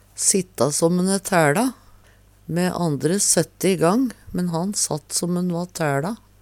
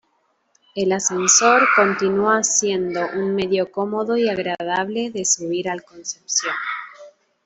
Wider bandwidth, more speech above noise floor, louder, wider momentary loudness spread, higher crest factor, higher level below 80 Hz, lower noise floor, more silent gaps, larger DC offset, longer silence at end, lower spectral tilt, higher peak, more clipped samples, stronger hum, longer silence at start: first, 17 kHz vs 8.4 kHz; second, 31 dB vs 47 dB; about the same, -21 LUFS vs -19 LUFS; second, 8 LU vs 14 LU; about the same, 18 dB vs 18 dB; first, -54 dBFS vs -62 dBFS; second, -52 dBFS vs -66 dBFS; neither; neither; about the same, 0.25 s vs 0.35 s; first, -4 dB/octave vs -2.5 dB/octave; about the same, -2 dBFS vs -2 dBFS; neither; neither; second, 0.15 s vs 0.75 s